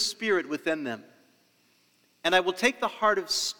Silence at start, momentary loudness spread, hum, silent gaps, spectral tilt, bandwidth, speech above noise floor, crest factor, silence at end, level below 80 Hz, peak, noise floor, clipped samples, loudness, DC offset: 0 s; 8 LU; none; none; -2 dB/octave; over 20 kHz; 39 dB; 22 dB; 0.1 s; -70 dBFS; -6 dBFS; -66 dBFS; under 0.1%; -27 LUFS; under 0.1%